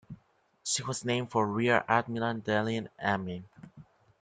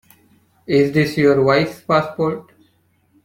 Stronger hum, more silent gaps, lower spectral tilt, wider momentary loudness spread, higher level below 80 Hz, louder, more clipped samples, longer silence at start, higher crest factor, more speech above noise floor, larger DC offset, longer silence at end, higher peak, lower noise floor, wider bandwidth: neither; neither; second, -4 dB/octave vs -7 dB/octave; about the same, 8 LU vs 8 LU; second, -68 dBFS vs -54 dBFS; second, -30 LUFS vs -17 LUFS; neither; second, 0.1 s vs 0.7 s; first, 22 dB vs 16 dB; second, 37 dB vs 44 dB; neither; second, 0.4 s vs 0.85 s; second, -10 dBFS vs -2 dBFS; first, -67 dBFS vs -60 dBFS; second, 9.8 kHz vs 16 kHz